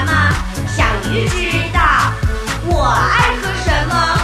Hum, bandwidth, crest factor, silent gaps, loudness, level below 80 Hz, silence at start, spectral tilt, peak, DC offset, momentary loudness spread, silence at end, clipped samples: none; 15 kHz; 14 dB; none; -15 LUFS; -22 dBFS; 0 s; -4.5 dB/octave; 0 dBFS; under 0.1%; 7 LU; 0 s; under 0.1%